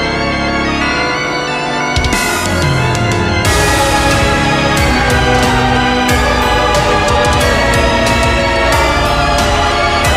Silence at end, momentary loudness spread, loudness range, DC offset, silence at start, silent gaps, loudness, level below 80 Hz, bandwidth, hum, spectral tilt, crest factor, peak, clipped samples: 0 s; 3 LU; 2 LU; under 0.1%; 0 s; none; -11 LUFS; -22 dBFS; 16 kHz; none; -4 dB/octave; 12 dB; 0 dBFS; under 0.1%